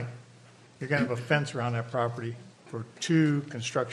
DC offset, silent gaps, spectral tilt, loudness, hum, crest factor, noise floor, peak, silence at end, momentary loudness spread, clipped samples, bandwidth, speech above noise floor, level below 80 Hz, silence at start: under 0.1%; none; -6 dB/octave; -29 LUFS; none; 20 dB; -54 dBFS; -10 dBFS; 0 s; 16 LU; under 0.1%; 11.5 kHz; 26 dB; -70 dBFS; 0 s